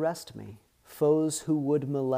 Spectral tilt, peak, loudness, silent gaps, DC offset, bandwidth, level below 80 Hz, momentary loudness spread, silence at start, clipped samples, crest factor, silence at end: -6 dB/octave; -14 dBFS; -27 LUFS; none; under 0.1%; 15.5 kHz; -68 dBFS; 19 LU; 0 s; under 0.1%; 14 dB; 0 s